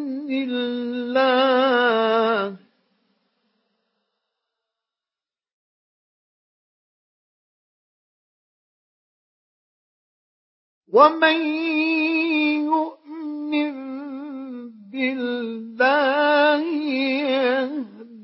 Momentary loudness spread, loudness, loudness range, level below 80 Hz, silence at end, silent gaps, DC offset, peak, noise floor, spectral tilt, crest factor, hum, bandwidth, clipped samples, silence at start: 16 LU; -20 LUFS; 6 LU; -84 dBFS; 0 s; 5.53-10.81 s; under 0.1%; -2 dBFS; under -90 dBFS; -8 dB/octave; 22 dB; none; 5.8 kHz; under 0.1%; 0 s